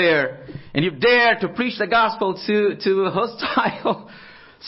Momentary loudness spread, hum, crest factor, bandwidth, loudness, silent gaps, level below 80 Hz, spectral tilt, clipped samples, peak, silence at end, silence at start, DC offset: 10 LU; none; 16 dB; 5.8 kHz; -20 LUFS; none; -56 dBFS; -9 dB/octave; under 0.1%; -4 dBFS; 0 s; 0 s; under 0.1%